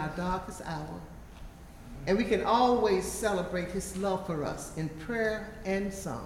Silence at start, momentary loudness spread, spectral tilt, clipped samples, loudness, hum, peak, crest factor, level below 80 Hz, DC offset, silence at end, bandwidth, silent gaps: 0 s; 23 LU; -5 dB/octave; under 0.1%; -31 LUFS; none; -12 dBFS; 18 dB; -48 dBFS; under 0.1%; 0 s; 16.5 kHz; none